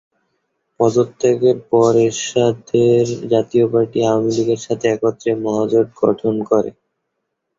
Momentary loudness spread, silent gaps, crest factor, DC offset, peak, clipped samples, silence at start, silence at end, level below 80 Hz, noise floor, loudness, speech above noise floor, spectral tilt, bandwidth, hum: 5 LU; none; 14 dB; under 0.1%; -2 dBFS; under 0.1%; 0.8 s; 0.9 s; -56 dBFS; -75 dBFS; -16 LUFS; 59 dB; -6 dB/octave; 7.8 kHz; none